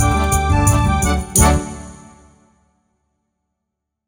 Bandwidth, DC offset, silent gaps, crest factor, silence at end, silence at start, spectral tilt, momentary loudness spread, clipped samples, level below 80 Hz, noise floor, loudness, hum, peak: 17.5 kHz; under 0.1%; none; 18 dB; 2.1 s; 0 s; -4.5 dB/octave; 18 LU; under 0.1%; -24 dBFS; -78 dBFS; -15 LUFS; none; 0 dBFS